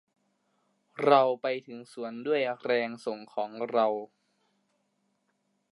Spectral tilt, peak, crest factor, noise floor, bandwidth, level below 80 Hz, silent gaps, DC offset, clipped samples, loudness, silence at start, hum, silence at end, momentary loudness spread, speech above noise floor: -6 dB/octave; -8 dBFS; 22 dB; -76 dBFS; 11.5 kHz; -86 dBFS; none; under 0.1%; under 0.1%; -29 LUFS; 0.95 s; 50 Hz at -75 dBFS; 1.65 s; 17 LU; 48 dB